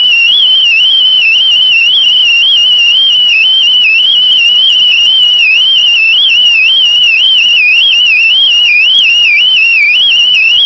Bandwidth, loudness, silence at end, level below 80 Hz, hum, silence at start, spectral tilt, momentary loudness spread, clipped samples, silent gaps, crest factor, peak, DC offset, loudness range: 8 kHz; -3 LUFS; 0 s; -52 dBFS; none; 0 s; 2.5 dB/octave; 0 LU; 0.2%; none; 6 dB; 0 dBFS; 0.2%; 0 LU